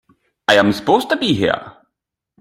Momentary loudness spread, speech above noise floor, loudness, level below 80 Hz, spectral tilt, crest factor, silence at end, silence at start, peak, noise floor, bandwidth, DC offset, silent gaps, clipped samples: 8 LU; 64 dB; -16 LUFS; -54 dBFS; -5 dB/octave; 18 dB; 0.7 s; 0.5 s; 0 dBFS; -79 dBFS; 15.5 kHz; under 0.1%; none; under 0.1%